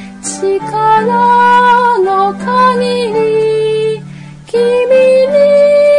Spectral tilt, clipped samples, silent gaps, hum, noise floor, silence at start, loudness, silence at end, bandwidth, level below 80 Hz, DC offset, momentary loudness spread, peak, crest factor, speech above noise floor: -4.5 dB/octave; under 0.1%; none; none; -29 dBFS; 0 s; -10 LUFS; 0 s; 11 kHz; -48 dBFS; under 0.1%; 9 LU; 0 dBFS; 8 dB; 20 dB